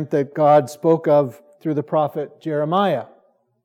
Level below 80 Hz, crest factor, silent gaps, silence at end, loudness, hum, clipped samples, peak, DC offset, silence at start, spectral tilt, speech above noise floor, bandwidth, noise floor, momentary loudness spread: -82 dBFS; 16 dB; none; 0.6 s; -19 LUFS; none; under 0.1%; -4 dBFS; under 0.1%; 0 s; -7.5 dB/octave; 40 dB; 15 kHz; -59 dBFS; 11 LU